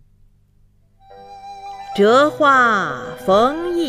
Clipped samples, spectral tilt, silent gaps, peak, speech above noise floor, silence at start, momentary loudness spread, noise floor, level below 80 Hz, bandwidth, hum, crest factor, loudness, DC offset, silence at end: under 0.1%; -5 dB/octave; none; -2 dBFS; 39 dB; 1.2 s; 21 LU; -54 dBFS; -52 dBFS; 15 kHz; none; 16 dB; -15 LUFS; under 0.1%; 0 s